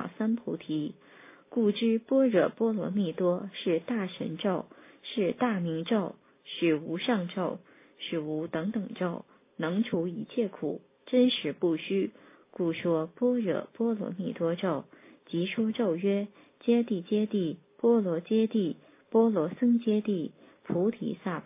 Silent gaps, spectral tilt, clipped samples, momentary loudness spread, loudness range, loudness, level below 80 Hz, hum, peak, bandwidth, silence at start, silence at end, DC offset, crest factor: none; -5.5 dB/octave; under 0.1%; 11 LU; 4 LU; -30 LUFS; -76 dBFS; none; -12 dBFS; 3.8 kHz; 0 s; 0.05 s; under 0.1%; 18 dB